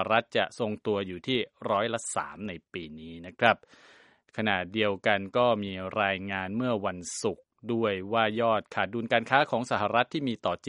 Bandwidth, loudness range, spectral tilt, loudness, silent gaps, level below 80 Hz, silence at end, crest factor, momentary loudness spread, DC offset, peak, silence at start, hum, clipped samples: 11 kHz; 3 LU; -4.5 dB/octave; -28 LUFS; none; -66 dBFS; 0 s; 24 dB; 12 LU; under 0.1%; -4 dBFS; 0 s; none; under 0.1%